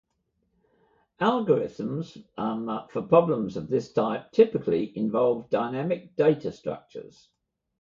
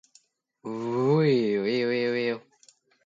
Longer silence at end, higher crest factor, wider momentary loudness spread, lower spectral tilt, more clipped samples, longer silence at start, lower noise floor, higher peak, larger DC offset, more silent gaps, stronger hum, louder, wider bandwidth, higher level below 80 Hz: first, 0.8 s vs 0.65 s; about the same, 20 dB vs 16 dB; about the same, 13 LU vs 15 LU; about the same, -8 dB/octave vs -7.5 dB/octave; neither; first, 1.2 s vs 0.65 s; first, -75 dBFS vs -63 dBFS; first, -6 dBFS vs -12 dBFS; neither; neither; neither; about the same, -26 LUFS vs -25 LUFS; about the same, 7.4 kHz vs 7.8 kHz; first, -64 dBFS vs -74 dBFS